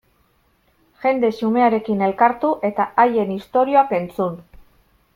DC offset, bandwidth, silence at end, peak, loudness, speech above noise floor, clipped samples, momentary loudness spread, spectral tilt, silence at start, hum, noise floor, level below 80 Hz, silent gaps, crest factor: under 0.1%; 16 kHz; 0.75 s; -2 dBFS; -19 LUFS; 43 dB; under 0.1%; 8 LU; -8 dB/octave; 1 s; none; -61 dBFS; -58 dBFS; none; 18 dB